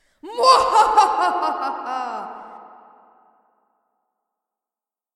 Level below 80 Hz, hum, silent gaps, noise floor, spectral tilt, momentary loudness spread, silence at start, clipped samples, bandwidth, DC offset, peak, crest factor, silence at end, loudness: -58 dBFS; none; none; under -90 dBFS; -1 dB/octave; 19 LU; 0.25 s; under 0.1%; 13.5 kHz; under 0.1%; 0 dBFS; 22 dB; 2.5 s; -18 LUFS